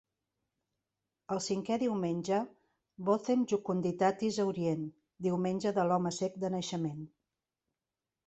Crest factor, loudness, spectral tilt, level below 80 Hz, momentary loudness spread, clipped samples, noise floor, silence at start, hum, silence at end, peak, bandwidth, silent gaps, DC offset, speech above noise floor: 18 dB; -33 LUFS; -6 dB/octave; -74 dBFS; 8 LU; under 0.1%; under -90 dBFS; 1.3 s; none; 1.2 s; -16 dBFS; 8.4 kHz; none; under 0.1%; over 58 dB